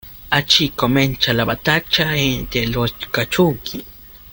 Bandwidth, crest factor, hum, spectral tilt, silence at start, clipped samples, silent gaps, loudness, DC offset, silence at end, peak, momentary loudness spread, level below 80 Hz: 17 kHz; 18 dB; none; -4.5 dB/octave; 0.05 s; under 0.1%; none; -17 LUFS; under 0.1%; 0 s; 0 dBFS; 9 LU; -38 dBFS